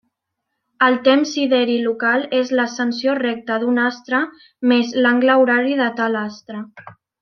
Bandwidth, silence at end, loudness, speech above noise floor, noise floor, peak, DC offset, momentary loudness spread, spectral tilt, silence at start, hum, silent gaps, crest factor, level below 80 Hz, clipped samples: 6.6 kHz; 0.3 s; -17 LUFS; 60 dB; -77 dBFS; -2 dBFS; under 0.1%; 10 LU; -4 dB/octave; 0.8 s; none; none; 16 dB; -70 dBFS; under 0.1%